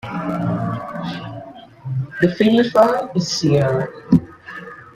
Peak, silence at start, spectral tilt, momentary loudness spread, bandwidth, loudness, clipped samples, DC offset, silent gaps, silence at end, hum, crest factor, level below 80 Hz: -2 dBFS; 0.05 s; -6.5 dB/octave; 20 LU; 14 kHz; -18 LUFS; under 0.1%; under 0.1%; none; 0.05 s; none; 18 dB; -52 dBFS